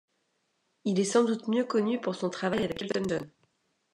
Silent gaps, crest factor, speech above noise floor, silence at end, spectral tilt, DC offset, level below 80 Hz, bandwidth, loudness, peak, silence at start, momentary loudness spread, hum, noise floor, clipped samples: none; 18 dB; 48 dB; 0.65 s; -5 dB/octave; under 0.1%; -66 dBFS; 11 kHz; -29 LUFS; -12 dBFS; 0.85 s; 8 LU; none; -76 dBFS; under 0.1%